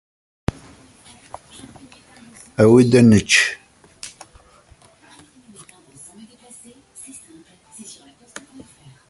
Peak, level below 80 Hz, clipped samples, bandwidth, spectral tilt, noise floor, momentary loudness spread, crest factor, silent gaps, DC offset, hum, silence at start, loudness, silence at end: -2 dBFS; -48 dBFS; under 0.1%; 11.5 kHz; -5 dB/octave; -51 dBFS; 29 LU; 20 dB; none; under 0.1%; none; 2.6 s; -15 LUFS; 5 s